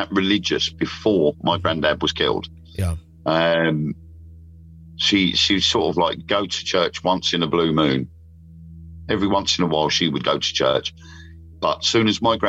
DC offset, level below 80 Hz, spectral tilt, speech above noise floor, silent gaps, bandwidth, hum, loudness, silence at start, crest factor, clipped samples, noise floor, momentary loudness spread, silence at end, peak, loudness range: under 0.1%; -44 dBFS; -4.5 dB/octave; 23 dB; none; 13 kHz; none; -20 LUFS; 0 s; 16 dB; under 0.1%; -43 dBFS; 9 LU; 0 s; -6 dBFS; 3 LU